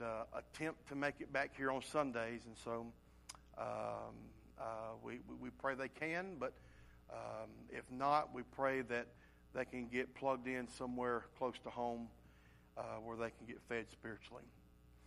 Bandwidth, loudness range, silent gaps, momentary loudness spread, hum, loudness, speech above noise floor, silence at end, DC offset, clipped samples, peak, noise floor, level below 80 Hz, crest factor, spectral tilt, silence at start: 15 kHz; 6 LU; none; 15 LU; none; -44 LUFS; 22 dB; 0 s; under 0.1%; under 0.1%; -22 dBFS; -66 dBFS; -68 dBFS; 24 dB; -5.5 dB/octave; 0 s